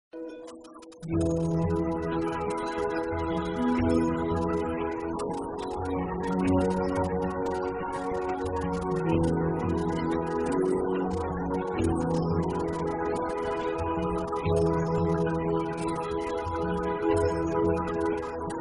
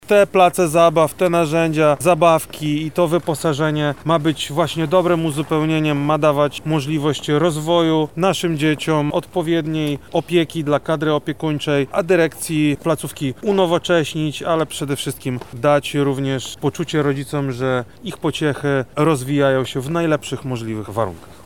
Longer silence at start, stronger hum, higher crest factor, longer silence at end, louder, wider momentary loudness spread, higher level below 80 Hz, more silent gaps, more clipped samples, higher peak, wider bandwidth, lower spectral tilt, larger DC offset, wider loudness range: about the same, 0.15 s vs 0.1 s; neither; about the same, 16 dB vs 16 dB; second, 0 s vs 0.15 s; second, -29 LUFS vs -18 LUFS; about the same, 6 LU vs 8 LU; about the same, -46 dBFS vs -50 dBFS; neither; neither; second, -12 dBFS vs -2 dBFS; second, 11 kHz vs 18 kHz; first, -7.5 dB/octave vs -5.5 dB/octave; second, under 0.1% vs 0.5%; about the same, 1 LU vs 3 LU